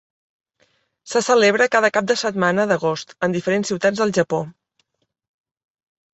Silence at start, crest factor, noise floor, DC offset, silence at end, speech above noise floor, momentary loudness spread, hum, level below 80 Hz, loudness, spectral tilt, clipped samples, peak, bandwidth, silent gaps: 1.05 s; 18 dB; -69 dBFS; under 0.1%; 1.6 s; 50 dB; 9 LU; none; -64 dBFS; -19 LUFS; -4 dB/octave; under 0.1%; -2 dBFS; 8.2 kHz; none